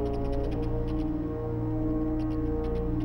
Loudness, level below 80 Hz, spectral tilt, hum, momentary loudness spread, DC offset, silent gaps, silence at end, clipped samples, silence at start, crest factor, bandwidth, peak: -31 LUFS; -34 dBFS; -10 dB/octave; none; 2 LU; under 0.1%; none; 0 s; under 0.1%; 0 s; 12 dB; 6 kHz; -18 dBFS